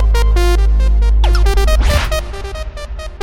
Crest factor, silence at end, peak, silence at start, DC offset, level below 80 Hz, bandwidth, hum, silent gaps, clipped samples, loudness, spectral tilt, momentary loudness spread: 10 dB; 0 s; -2 dBFS; 0 s; under 0.1%; -12 dBFS; 14 kHz; none; none; under 0.1%; -14 LUFS; -5.5 dB/octave; 13 LU